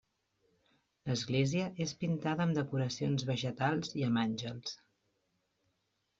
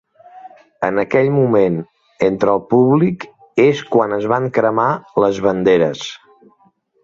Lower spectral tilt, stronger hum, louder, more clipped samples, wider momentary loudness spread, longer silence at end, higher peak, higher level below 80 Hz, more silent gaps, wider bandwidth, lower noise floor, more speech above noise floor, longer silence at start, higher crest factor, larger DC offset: second, -5.5 dB/octave vs -7 dB/octave; neither; second, -35 LUFS vs -16 LUFS; neither; about the same, 9 LU vs 8 LU; first, 1.45 s vs 0.85 s; second, -18 dBFS vs -2 dBFS; second, -70 dBFS vs -54 dBFS; neither; about the same, 7.8 kHz vs 7.6 kHz; first, -81 dBFS vs -57 dBFS; first, 47 dB vs 42 dB; first, 1.05 s vs 0.35 s; about the same, 18 dB vs 14 dB; neither